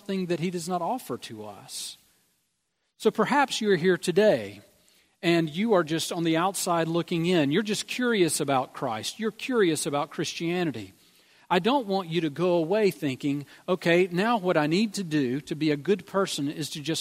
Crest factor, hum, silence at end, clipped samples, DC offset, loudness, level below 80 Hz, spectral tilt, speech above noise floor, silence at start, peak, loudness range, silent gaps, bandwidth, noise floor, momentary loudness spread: 20 dB; none; 0 s; under 0.1%; under 0.1%; -26 LUFS; -72 dBFS; -4.5 dB/octave; 51 dB; 0.1 s; -8 dBFS; 3 LU; none; 16 kHz; -77 dBFS; 8 LU